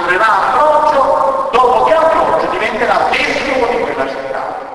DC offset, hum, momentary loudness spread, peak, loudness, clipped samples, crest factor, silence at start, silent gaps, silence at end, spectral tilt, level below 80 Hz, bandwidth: under 0.1%; none; 8 LU; 0 dBFS; -12 LUFS; under 0.1%; 12 dB; 0 s; none; 0 s; -4 dB/octave; -42 dBFS; 11 kHz